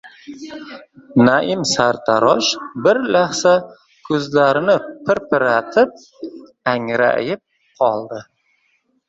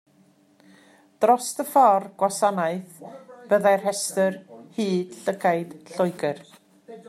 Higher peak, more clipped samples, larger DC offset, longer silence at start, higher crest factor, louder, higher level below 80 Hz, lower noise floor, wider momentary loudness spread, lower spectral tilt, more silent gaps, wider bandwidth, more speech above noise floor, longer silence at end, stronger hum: first, 0 dBFS vs -6 dBFS; neither; neither; second, 0.05 s vs 1.2 s; about the same, 18 dB vs 18 dB; first, -17 LUFS vs -23 LUFS; first, -58 dBFS vs -78 dBFS; first, -64 dBFS vs -59 dBFS; about the same, 19 LU vs 19 LU; about the same, -4 dB/octave vs -4.5 dB/octave; neither; second, 8 kHz vs 15 kHz; first, 47 dB vs 36 dB; first, 0.85 s vs 0.1 s; neither